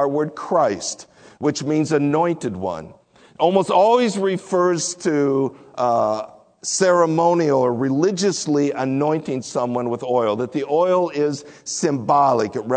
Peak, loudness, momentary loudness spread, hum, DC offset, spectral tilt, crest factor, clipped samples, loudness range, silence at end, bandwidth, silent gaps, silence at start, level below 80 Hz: -2 dBFS; -20 LUFS; 10 LU; none; under 0.1%; -5 dB/octave; 16 dB; under 0.1%; 2 LU; 0 s; 9.4 kHz; none; 0 s; -64 dBFS